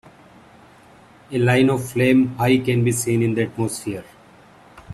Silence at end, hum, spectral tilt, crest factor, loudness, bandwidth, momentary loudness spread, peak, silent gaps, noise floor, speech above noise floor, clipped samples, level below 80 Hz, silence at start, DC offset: 0 s; none; -6 dB/octave; 18 dB; -19 LUFS; 14.5 kHz; 12 LU; -4 dBFS; none; -48 dBFS; 30 dB; under 0.1%; -54 dBFS; 1.3 s; under 0.1%